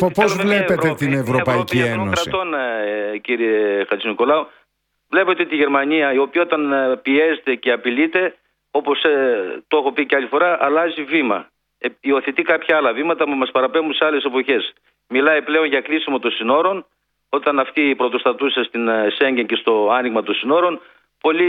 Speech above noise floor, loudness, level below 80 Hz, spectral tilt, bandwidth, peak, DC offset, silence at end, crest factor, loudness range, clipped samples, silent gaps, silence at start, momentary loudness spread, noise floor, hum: 48 dB; -18 LUFS; -58 dBFS; -5.5 dB/octave; 17 kHz; 0 dBFS; under 0.1%; 0 s; 18 dB; 1 LU; under 0.1%; none; 0 s; 5 LU; -66 dBFS; none